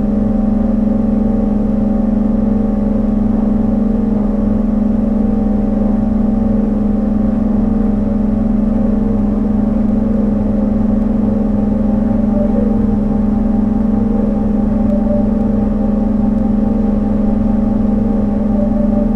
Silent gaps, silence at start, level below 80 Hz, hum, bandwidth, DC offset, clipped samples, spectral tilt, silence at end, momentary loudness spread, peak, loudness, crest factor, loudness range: none; 0 s; -22 dBFS; none; 3.3 kHz; under 0.1%; under 0.1%; -11 dB/octave; 0 s; 1 LU; -2 dBFS; -14 LUFS; 10 dB; 0 LU